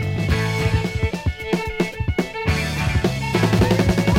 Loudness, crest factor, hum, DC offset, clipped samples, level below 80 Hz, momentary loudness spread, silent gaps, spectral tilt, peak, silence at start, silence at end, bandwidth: -21 LUFS; 18 dB; none; under 0.1%; under 0.1%; -30 dBFS; 7 LU; none; -6 dB/octave; -2 dBFS; 0 s; 0 s; 16.5 kHz